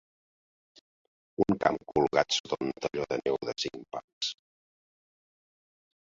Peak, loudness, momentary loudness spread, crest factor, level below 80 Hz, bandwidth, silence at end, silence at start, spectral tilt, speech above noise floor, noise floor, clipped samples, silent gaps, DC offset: -8 dBFS; -30 LUFS; 13 LU; 24 dB; -64 dBFS; 8 kHz; 1.8 s; 1.4 s; -4 dB/octave; over 59 dB; under -90 dBFS; under 0.1%; 2.40-2.44 s, 4.04-4.21 s; under 0.1%